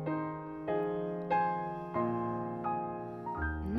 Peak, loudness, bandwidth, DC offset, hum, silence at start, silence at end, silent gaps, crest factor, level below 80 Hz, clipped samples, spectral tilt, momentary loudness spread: -18 dBFS; -35 LUFS; 6.4 kHz; under 0.1%; none; 0 s; 0 s; none; 16 dB; -50 dBFS; under 0.1%; -9.5 dB/octave; 8 LU